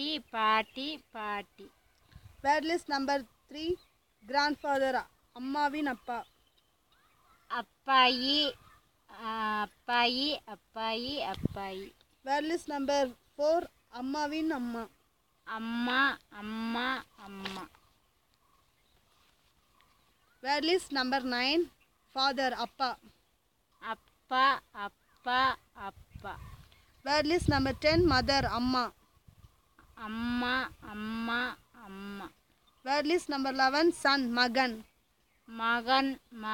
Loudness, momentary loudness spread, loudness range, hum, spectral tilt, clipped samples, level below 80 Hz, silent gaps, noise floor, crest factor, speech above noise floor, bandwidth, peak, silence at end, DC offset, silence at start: -31 LUFS; 18 LU; 7 LU; none; -4 dB/octave; under 0.1%; -56 dBFS; none; -74 dBFS; 22 dB; 42 dB; 17 kHz; -10 dBFS; 0 s; under 0.1%; 0 s